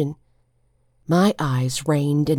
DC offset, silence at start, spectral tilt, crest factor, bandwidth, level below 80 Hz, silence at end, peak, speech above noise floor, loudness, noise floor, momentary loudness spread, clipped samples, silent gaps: under 0.1%; 0 s; -6.5 dB/octave; 16 dB; 17 kHz; -52 dBFS; 0 s; -6 dBFS; 44 dB; -21 LUFS; -63 dBFS; 18 LU; under 0.1%; none